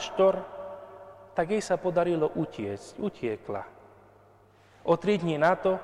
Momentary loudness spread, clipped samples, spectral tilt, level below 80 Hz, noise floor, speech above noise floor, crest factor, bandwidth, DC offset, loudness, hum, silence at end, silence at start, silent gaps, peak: 17 LU; under 0.1%; -6 dB/octave; -62 dBFS; -58 dBFS; 31 dB; 18 dB; 11.5 kHz; under 0.1%; -28 LUFS; none; 0 s; 0 s; none; -10 dBFS